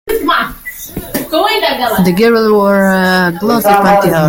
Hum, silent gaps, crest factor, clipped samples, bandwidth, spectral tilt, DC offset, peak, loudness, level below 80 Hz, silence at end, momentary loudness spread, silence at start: none; none; 10 dB; under 0.1%; 17 kHz; -5.5 dB/octave; under 0.1%; 0 dBFS; -11 LUFS; -38 dBFS; 0 s; 11 LU; 0.05 s